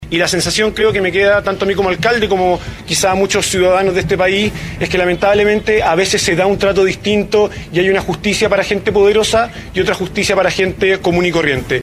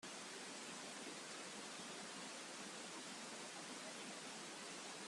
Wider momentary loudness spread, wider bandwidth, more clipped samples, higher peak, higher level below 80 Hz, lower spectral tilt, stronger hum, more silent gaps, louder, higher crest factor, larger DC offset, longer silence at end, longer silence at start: first, 4 LU vs 0 LU; first, 14.5 kHz vs 13 kHz; neither; first, 0 dBFS vs -40 dBFS; first, -34 dBFS vs under -90 dBFS; first, -4 dB/octave vs -1.5 dB/octave; neither; neither; first, -13 LUFS vs -50 LUFS; about the same, 14 dB vs 14 dB; neither; about the same, 0 s vs 0 s; about the same, 0 s vs 0 s